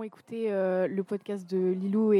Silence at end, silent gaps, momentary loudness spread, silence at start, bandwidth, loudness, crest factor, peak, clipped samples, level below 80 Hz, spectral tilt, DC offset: 0 s; none; 7 LU; 0 s; 11 kHz; -30 LUFS; 14 dB; -14 dBFS; under 0.1%; -90 dBFS; -9 dB/octave; under 0.1%